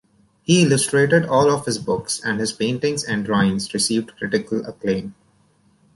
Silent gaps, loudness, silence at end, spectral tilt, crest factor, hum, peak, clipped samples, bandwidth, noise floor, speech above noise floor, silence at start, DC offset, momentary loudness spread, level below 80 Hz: none; -20 LUFS; 0.85 s; -4.5 dB/octave; 18 dB; none; -4 dBFS; under 0.1%; 11.5 kHz; -59 dBFS; 39 dB; 0.5 s; under 0.1%; 9 LU; -54 dBFS